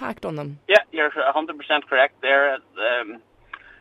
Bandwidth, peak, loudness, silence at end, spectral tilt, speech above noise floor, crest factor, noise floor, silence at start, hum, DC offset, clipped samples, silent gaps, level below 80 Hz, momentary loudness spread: 11.5 kHz; -2 dBFS; -21 LUFS; 0.25 s; -4.5 dB/octave; 22 dB; 20 dB; -44 dBFS; 0 s; none; under 0.1%; under 0.1%; none; -64 dBFS; 13 LU